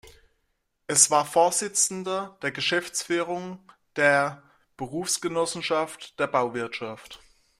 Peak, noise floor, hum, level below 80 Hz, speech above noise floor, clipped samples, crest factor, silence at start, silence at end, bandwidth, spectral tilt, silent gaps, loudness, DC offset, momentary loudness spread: -2 dBFS; -74 dBFS; none; -66 dBFS; 49 dB; under 0.1%; 26 dB; 0.05 s; 0.45 s; 15.5 kHz; -2 dB/octave; none; -25 LUFS; under 0.1%; 16 LU